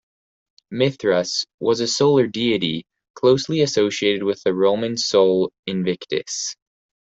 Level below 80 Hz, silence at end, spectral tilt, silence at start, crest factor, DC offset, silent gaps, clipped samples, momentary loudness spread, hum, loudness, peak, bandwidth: -62 dBFS; 0.55 s; -4.5 dB/octave; 0.7 s; 16 dB; under 0.1%; 1.54-1.58 s, 3.10-3.14 s, 5.59-5.63 s; under 0.1%; 8 LU; none; -20 LUFS; -4 dBFS; 8.2 kHz